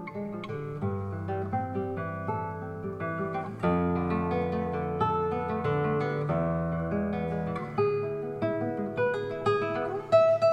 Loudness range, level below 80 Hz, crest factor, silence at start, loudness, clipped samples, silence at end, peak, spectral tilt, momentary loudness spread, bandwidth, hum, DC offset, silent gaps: 4 LU; -54 dBFS; 18 dB; 0 s; -30 LUFS; under 0.1%; 0 s; -10 dBFS; -8.5 dB/octave; 6 LU; 8.8 kHz; none; under 0.1%; none